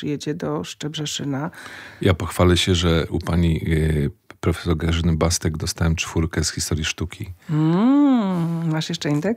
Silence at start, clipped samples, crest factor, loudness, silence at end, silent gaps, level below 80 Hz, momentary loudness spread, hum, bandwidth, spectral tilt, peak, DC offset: 0 s; under 0.1%; 18 dB; -21 LUFS; 0 s; none; -34 dBFS; 11 LU; none; 16 kHz; -5.5 dB/octave; -4 dBFS; under 0.1%